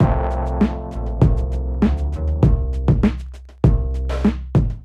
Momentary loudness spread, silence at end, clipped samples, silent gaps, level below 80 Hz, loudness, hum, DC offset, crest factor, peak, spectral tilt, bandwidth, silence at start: 6 LU; 0 s; under 0.1%; none; -22 dBFS; -20 LUFS; none; under 0.1%; 16 dB; -2 dBFS; -9.5 dB/octave; 7 kHz; 0 s